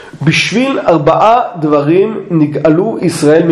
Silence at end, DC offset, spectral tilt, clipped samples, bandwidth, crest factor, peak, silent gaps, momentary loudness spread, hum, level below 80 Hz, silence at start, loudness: 0 s; under 0.1%; -6 dB/octave; 0.4%; 12.5 kHz; 10 dB; 0 dBFS; none; 5 LU; none; -46 dBFS; 0 s; -10 LUFS